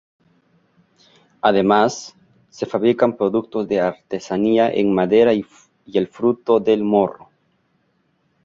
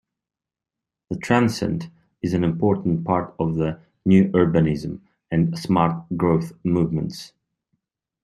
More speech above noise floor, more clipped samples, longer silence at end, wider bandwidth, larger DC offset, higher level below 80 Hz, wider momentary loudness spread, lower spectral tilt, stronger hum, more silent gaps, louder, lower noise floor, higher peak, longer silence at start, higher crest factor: second, 47 dB vs 68 dB; neither; first, 1.3 s vs 0.95 s; second, 7.6 kHz vs 12.5 kHz; neither; second, -58 dBFS vs -50 dBFS; second, 10 LU vs 13 LU; second, -6 dB/octave vs -7.5 dB/octave; neither; neither; first, -18 LUFS vs -22 LUFS; second, -65 dBFS vs -89 dBFS; about the same, -2 dBFS vs -2 dBFS; first, 1.45 s vs 1.1 s; about the same, 18 dB vs 20 dB